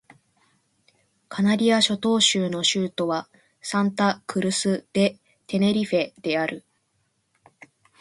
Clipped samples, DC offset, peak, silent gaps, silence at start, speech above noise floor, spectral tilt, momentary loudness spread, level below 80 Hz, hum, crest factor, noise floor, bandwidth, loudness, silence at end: under 0.1%; under 0.1%; -6 dBFS; none; 1.3 s; 49 dB; -4 dB/octave; 10 LU; -66 dBFS; none; 20 dB; -71 dBFS; 11.5 kHz; -23 LUFS; 1.4 s